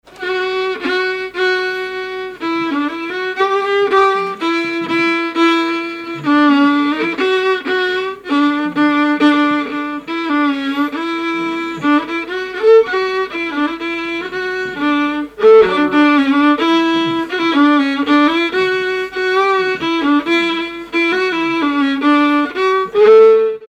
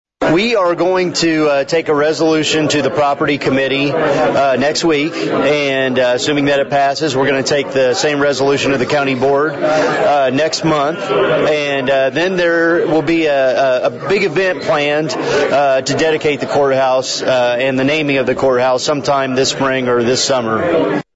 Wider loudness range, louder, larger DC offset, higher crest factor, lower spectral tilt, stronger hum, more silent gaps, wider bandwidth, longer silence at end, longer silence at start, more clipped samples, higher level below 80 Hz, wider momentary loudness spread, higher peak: first, 4 LU vs 0 LU; about the same, -15 LUFS vs -14 LUFS; neither; about the same, 12 dB vs 10 dB; about the same, -4.5 dB/octave vs -4 dB/octave; neither; neither; first, 9.2 kHz vs 8 kHz; about the same, 0.05 s vs 0.15 s; about the same, 0.1 s vs 0.2 s; neither; about the same, -54 dBFS vs -50 dBFS; first, 10 LU vs 2 LU; about the same, -2 dBFS vs -4 dBFS